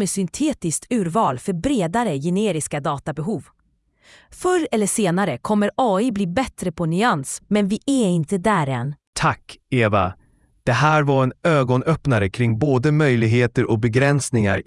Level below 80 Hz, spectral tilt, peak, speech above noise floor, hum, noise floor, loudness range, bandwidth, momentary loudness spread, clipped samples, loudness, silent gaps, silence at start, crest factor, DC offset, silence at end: -48 dBFS; -6 dB/octave; -2 dBFS; 43 dB; none; -62 dBFS; 5 LU; 12 kHz; 8 LU; under 0.1%; -20 LUFS; 9.07-9.13 s; 0 s; 18 dB; under 0.1%; 0.05 s